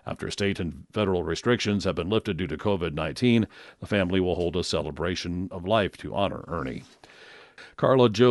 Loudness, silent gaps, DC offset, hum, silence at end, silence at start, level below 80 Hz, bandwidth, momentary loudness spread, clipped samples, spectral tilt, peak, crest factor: -26 LUFS; none; under 0.1%; none; 0 s; 0.05 s; -48 dBFS; 11.5 kHz; 10 LU; under 0.1%; -6 dB/octave; -6 dBFS; 20 dB